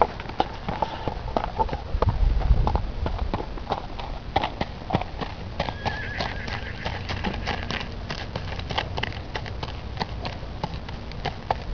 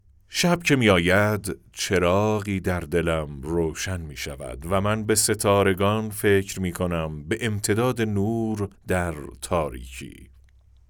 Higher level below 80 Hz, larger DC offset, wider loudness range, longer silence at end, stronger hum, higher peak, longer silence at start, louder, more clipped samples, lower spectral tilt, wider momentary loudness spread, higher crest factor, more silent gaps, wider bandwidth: first, -30 dBFS vs -46 dBFS; first, 0.6% vs under 0.1%; about the same, 4 LU vs 4 LU; second, 0 s vs 0.65 s; neither; first, 0 dBFS vs -6 dBFS; second, 0 s vs 0.3 s; second, -29 LUFS vs -24 LUFS; neither; first, -6 dB/octave vs -4.5 dB/octave; second, 8 LU vs 12 LU; first, 28 dB vs 18 dB; neither; second, 5.4 kHz vs over 20 kHz